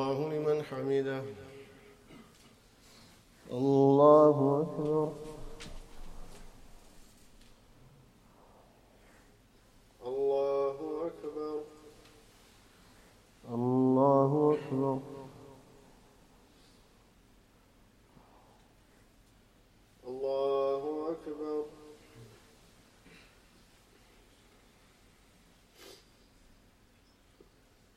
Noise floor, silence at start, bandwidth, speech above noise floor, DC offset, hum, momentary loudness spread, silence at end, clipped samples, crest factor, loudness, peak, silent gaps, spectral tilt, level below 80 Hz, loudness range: -64 dBFS; 0 s; 13 kHz; 37 dB; under 0.1%; none; 28 LU; 2.05 s; under 0.1%; 24 dB; -30 LUFS; -10 dBFS; none; -8 dB/octave; -60 dBFS; 16 LU